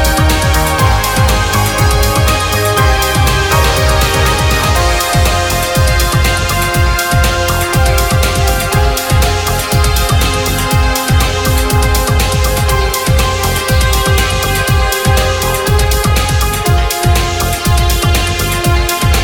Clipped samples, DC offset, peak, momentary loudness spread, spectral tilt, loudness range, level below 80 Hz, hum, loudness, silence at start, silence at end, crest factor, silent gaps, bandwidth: under 0.1%; 0.4%; 0 dBFS; 2 LU; -4 dB/octave; 1 LU; -16 dBFS; none; -11 LUFS; 0 s; 0 s; 10 dB; none; 19.5 kHz